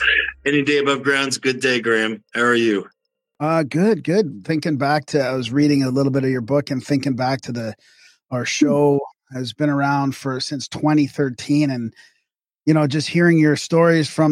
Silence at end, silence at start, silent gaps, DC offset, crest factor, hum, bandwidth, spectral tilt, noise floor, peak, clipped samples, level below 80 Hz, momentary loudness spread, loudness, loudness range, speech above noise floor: 0 s; 0 s; none; under 0.1%; 16 dB; none; 12.5 kHz; -5.5 dB/octave; -74 dBFS; -4 dBFS; under 0.1%; -56 dBFS; 9 LU; -19 LUFS; 3 LU; 56 dB